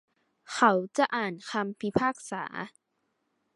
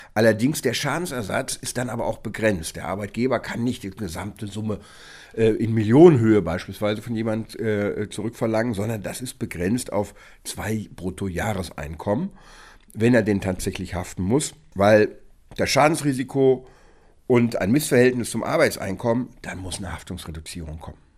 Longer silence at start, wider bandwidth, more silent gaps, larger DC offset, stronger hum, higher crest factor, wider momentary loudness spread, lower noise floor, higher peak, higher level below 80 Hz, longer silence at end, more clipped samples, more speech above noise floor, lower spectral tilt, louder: first, 0.5 s vs 0 s; second, 11.5 kHz vs 15.5 kHz; neither; neither; neither; about the same, 22 dB vs 22 dB; about the same, 14 LU vs 15 LU; first, -78 dBFS vs -52 dBFS; second, -8 dBFS vs 0 dBFS; second, -68 dBFS vs -46 dBFS; first, 0.9 s vs 0.25 s; neither; first, 49 dB vs 30 dB; about the same, -4.5 dB/octave vs -5.5 dB/octave; second, -29 LUFS vs -23 LUFS